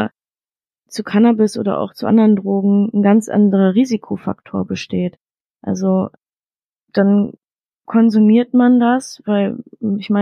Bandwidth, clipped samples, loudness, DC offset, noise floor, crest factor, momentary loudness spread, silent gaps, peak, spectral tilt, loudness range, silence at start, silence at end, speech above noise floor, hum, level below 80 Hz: 10 kHz; under 0.1%; -16 LUFS; under 0.1%; under -90 dBFS; 14 dB; 12 LU; 5.21-5.25 s, 5.41-5.45 s, 6.65-6.73 s; -2 dBFS; -7.5 dB/octave; 6 LU; 0 s; 0 s; over 76 dB; none; -62 dBFS